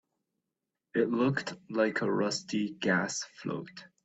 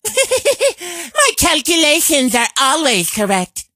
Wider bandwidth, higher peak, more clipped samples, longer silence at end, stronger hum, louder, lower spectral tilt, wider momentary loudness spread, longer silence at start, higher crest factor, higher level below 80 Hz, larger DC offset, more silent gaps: second, 8.4 kHz vs 16 kHz; second, -14 dBFS vs 0 dBFS; neither; about the same, 0.2 s vs 0.15 s; neither; second, -31 LUFS vs -13 LUFS; first, -4.5 dB/octave vs -1.5 dB/octave; first, 10 LU vs 7 LU; first, 0.95 s vs 0.05 s; about the same, 18 dB vs 14 dB; second, -72 dBFS vs -42 dBFS; neither; neither